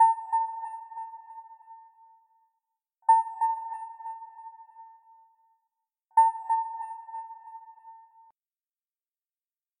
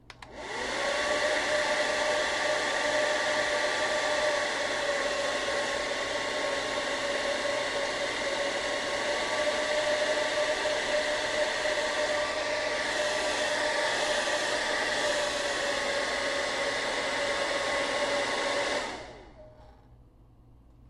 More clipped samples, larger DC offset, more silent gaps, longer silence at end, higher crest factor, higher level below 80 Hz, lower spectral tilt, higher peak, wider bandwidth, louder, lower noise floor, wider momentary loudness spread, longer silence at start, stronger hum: neither; neither; neither; first, 1.85 s vs 0 s; first, 20 dB vs 14 dB; second, under -90 dBFS vs -58 dBFS; second, 2.5 dB/octave vs -1 dB/octave; about the same, -12 dBFS vs -14 dBFS; second, 10 kHz vs 13 kHz; about the same, -28 LUFS vs -28 LUFS; first, under -90 dBFS vs -56 dBFS; first, 25 LU vs 3 LU; about the same, 0 s vs 0.1 s; neither